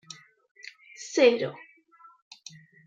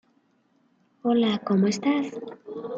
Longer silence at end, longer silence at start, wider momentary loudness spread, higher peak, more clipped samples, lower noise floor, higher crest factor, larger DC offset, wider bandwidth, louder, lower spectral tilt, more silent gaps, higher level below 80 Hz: first, 1.35 s vs 0 s; about the same, 1 s vs 1.05 s; first, 25 LU vs 15 LU; first, -8 dBFS vs -12 dBFS; neither; second, -57 dBFS vs -66 dBFS; first, 22 dB vs 16 dB; neither; about the same, 7.8 kHz vs 7.8 kHz; about the same, -24 LUFS vs -24 LUFS; second, -3.5 dB/octave vs -6 dB/octave; neither; second, -86 dBFS vs -74 dBFS